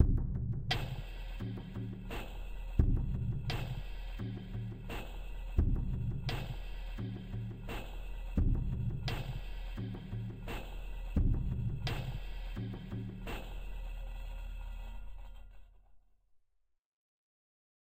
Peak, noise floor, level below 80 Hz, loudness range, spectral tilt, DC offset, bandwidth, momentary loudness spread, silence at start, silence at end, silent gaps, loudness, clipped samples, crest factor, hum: -10 dBFS; -73 dBFS; -40 dBFS; 11 LU; -7 dB/octave; under 0.1%; 16 kHz; 13 LU; 0 s; 1.75 s; none; -40 LUFS; under 0.1%; 26 dB; none